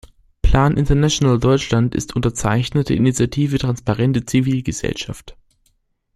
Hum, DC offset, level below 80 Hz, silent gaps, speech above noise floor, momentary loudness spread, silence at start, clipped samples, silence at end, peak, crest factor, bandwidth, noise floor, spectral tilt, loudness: none; under 0.1%; -28 dBFS; none; 47 dB; 8 LU; 0.45 s; under 0.1%; 0.85 s; -2 dBFS; 16 dB; 13 kHz; -64 dBFS; -6 dB/octave; -18 LUFS